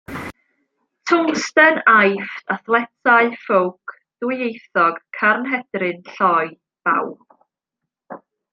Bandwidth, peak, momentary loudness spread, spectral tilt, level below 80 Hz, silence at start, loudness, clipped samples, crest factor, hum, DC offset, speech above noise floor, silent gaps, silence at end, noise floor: 14.5 kHz; 0 dBFS; 17 LU; -4.5 dB/octave; -64 dBFS; 0.1 s; -18 LUFS; under 0.1%; 18 dB; none; under 0.1%; 65 dB; none; 0.35 s; -82 dBFS